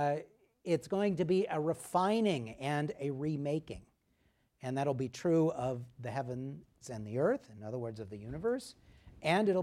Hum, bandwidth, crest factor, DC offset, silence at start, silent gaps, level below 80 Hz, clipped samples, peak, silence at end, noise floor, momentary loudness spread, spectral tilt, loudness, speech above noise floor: none; 15 kHz; 18 dB; under 0.1%; 0 s; none; -66 dBFS; under 0.1%; -16 dBFS; 0 s; -74 dBFS; 15 LU; -6.5 dB/octave; -35 LUFS; 40 dB